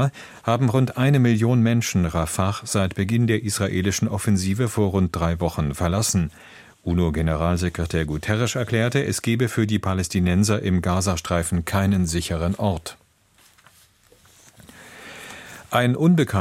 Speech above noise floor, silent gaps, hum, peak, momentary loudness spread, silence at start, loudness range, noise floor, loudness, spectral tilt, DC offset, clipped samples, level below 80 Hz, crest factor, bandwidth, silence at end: 36 dB; none; none; -4 dBFS; 7 LU; 0 s; 6 LU; -57 dBFS; -22 LUFS; -5.5 dB/octave; under 0.1%; under 0.1%; -40 dBFS; 18 dB; 16.5 kHz; 0 s